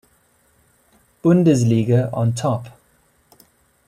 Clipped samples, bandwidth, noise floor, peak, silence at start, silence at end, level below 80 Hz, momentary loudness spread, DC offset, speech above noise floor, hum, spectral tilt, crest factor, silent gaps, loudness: under 0.1%; 13.5 kHz; -59 dBFS; -4 dBFS; 1.25 s; 1.2 s; -56 dBFS; 8 LU; under 0.1%; 43 dB; none; -7.5 dB/octave; 16 dB; none; -18 LUFS